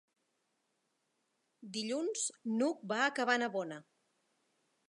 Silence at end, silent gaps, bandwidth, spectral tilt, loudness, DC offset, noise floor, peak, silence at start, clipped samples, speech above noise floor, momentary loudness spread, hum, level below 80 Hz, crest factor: 1.05 s; none; 11 kHz; -2.5 dB/octave; -35 LUFS; under 0.1%; -81 dBFS; -16 dBFS; 1.6 s; under 0.1%; 46 dB; 11 LU; none; under -90 dBFS; 22 dB